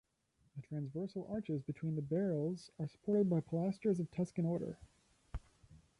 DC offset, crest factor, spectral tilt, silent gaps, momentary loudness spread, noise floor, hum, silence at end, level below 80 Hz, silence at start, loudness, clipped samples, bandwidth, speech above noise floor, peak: under 0.1%; 16 dB; -9 dB/octave; none; 18 LU; -77 dBFS; none; 0.2 s; -62 dBFS; 0.55 s; -39 LUFS; under 0.1%; 11 kHz; 39 dB; -24 dBFS